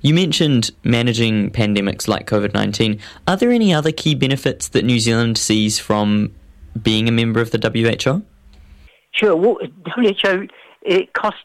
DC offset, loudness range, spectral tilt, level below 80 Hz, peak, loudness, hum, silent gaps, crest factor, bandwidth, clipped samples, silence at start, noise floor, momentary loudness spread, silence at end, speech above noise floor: under 0.1%; 2 LU; -5 dB/octave; -44 dBFS; 0 dBFS; -17 LUFS; none; none; 16 dB; 15 kHz; under 0.1%; 0.05 s; -46 dBFS; 7 LU; 0.05 s; 29 dB